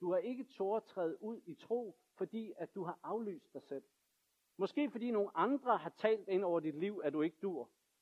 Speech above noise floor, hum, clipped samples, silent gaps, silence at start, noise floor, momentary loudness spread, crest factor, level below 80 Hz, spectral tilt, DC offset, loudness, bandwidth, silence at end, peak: 42 dB; none; under 0.1%; none; 0 s; -81 dBFS; 13 LU; 20 dB; under -90 dBFS; -7.5 dB/octave; under 0.1%; -39 LUFS; 12.5 kHz; 0.35 s; -20 dBFS